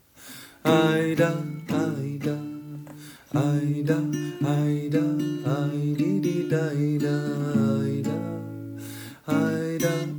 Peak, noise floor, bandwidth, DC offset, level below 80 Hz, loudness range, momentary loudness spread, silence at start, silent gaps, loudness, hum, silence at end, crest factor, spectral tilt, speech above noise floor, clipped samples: -8 dBFS; -45 dBFS; over 20 kHz; under 0.1%; -66 dBFS; 2 LU; 15 LU; 0.2 s; none; -25 LUFS; none; 0 s; 18 dB; -7 dB/octave; 22 dB; under 0.1%